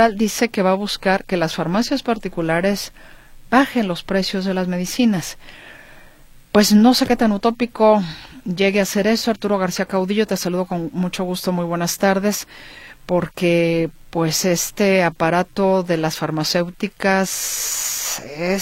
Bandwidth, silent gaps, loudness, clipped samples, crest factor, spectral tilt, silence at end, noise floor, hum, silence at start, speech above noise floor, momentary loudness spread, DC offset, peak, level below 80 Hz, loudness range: 16.5 kHz; none; -19 LUFS; under 0.1%; 18 dB; -4.5 dB/octave; 0 s; -45 dBFS; none; 0 s; 26 dB; 8 LU; under 0.1%; 0 dBFS; -46 dBFS; 4 LU